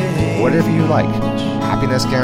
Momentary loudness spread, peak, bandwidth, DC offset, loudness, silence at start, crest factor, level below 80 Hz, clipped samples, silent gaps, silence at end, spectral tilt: 4 LU; 0 dBFS; 16 kHz; under 0.1%; -16 LUFS; 0 s; 14 dB; -36 dBFS; under 0.1%; none; 0 s; -6.5 dB/octave